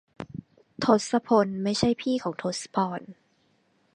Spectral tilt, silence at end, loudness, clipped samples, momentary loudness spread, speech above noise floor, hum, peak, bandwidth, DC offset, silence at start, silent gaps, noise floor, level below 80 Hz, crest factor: -5 dB/octave; 0.8 s; -26 LUFS; under 0.1%; 18 LU; 42 dB; none; -6 dBFS; 11 kHz; under 0.1%; 0.2 s; none; -67 dBFS; -60 dBFS; 22 dB